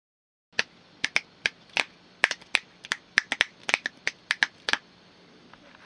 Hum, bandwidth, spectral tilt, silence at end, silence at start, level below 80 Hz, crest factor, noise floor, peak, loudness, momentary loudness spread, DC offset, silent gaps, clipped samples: none; 10.5 kHz; 0 dB/octave; 1.1 s; 0.6 s; -74 dBFS; 32 dB; -55 dBFS; 0 dBFS; -28 LUFS; 8 LU; under 0.1%; none; under 0.1%